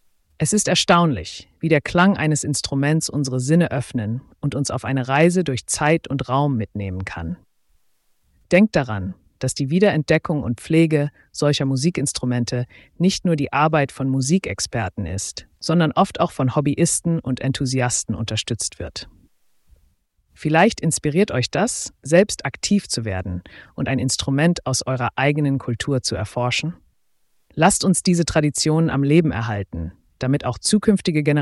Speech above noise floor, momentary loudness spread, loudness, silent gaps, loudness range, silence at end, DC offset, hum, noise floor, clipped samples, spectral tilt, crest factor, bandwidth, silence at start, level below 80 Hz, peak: 43 dB; 11 LU; -20 LUFS; none; 4 LU; 0 s; under 0.1%; none; -63 dBFS; under 0.1%; -5 dB/octave; 18 dB; 12 kHz; 0.4 s; -46 dBFS; -4 dBFS